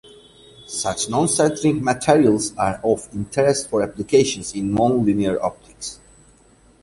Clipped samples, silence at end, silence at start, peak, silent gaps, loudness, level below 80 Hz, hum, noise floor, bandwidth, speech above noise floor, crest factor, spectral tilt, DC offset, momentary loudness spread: under 0.1%; 0.9 s; 0.6 s; -2 dBFS; none; -20 LUFS; -48 dBFS; none; -53 dBFS; 11.5 kHz; 34 dB; 18 dB; -4.5 dB/octave; under 0.1%; 10 LU